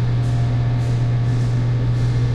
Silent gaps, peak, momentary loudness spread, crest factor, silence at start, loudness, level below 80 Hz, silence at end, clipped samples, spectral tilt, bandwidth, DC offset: none; -10 dBFS; 0 LU; 8 dB; 0 s; -19 LUFS; -30 dBFS; 0 s; under 0.1%; -8 dB/octave; 7.4 kHz; under 0.1%